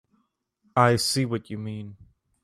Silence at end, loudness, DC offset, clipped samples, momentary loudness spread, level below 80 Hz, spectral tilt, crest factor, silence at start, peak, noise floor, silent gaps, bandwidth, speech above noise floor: 0.5 s; -24 LUFS; under 0.1%; under 0.1%; 17 LU; -60 dBFS; -4.5 dB/octave; 22 dB; 0.75 s; -4 dBFS; -72 dBFS; none; 14.5 kHz; 48 dB